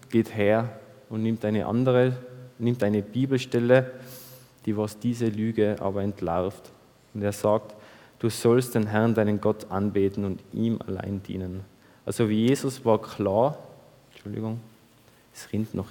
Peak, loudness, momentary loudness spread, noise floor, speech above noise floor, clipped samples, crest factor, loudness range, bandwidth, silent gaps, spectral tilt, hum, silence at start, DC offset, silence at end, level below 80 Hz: -6 dBFS; -26 LUFS; 15 LU; -57 dBFS; 32 dB; under 0.1%; 20 dB; 4 LU; 19 kHz; none; -7 dB/octave; none; 0.1 s; under 0.1%; 0 s; -62 dBFS